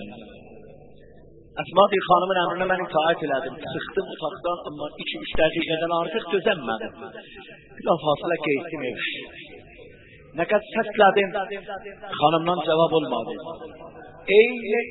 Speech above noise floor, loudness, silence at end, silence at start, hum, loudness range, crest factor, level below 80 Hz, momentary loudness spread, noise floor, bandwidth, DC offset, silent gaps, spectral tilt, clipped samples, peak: 25 dB; -23 LUFS; 0 s; 0 s; none; 4 LU; 22 dB; -54 dBFS; 21 LU; -49 dBFS; 4.1 kHz; under 0.1%; none; -9.5 dB/octave; under 0.1%; -2 dBFS